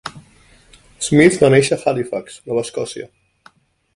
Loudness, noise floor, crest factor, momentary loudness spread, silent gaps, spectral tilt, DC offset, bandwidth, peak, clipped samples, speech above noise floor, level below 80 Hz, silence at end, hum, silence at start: -16 LUFS; -52 dBFS; 18 dB; 19 LU; none; -5 dB/octave; under 0.1%; 11.5 kHz; 0 dBFS; under 0.1%; 36 dB; -50 dBFS; 0.9 s; none; 0.05 s